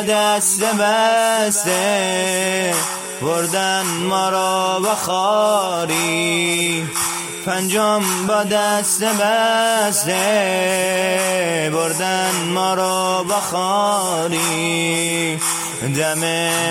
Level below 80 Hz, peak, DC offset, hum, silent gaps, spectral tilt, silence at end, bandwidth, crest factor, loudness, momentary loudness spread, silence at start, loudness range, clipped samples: -62 dBFS; -4 dBFS; under 0.1%; none; none; -2.5 dB/octave; 0 s; 16.5 kHz; 14 dB; -17 LUFS; 4 LU; 0 s; 2 LU; under 0.1%